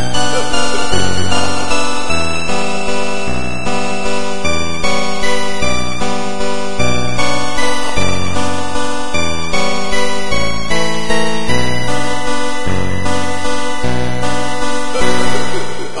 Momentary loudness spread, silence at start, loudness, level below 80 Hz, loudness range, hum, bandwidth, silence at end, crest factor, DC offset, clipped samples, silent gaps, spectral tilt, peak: 3 LU; 0 s; -17 LUFS; -32 dBFS; 1 LU; none; 11.5 kHz; 0 s; 16 dB; 30%; under 0.1%; none; -3.5 dB/octave; 0 dBFS